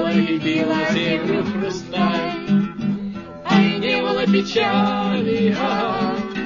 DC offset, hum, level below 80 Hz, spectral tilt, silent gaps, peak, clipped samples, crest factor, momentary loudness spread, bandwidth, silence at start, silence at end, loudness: under 0.1%; none; -52 dBFS; -6.5 dB/octave; none; -2 dBFS; under 0.1%; 16 dB; 7 LU; 7.4 kHz; 0 s; 0 s; -20 LUFS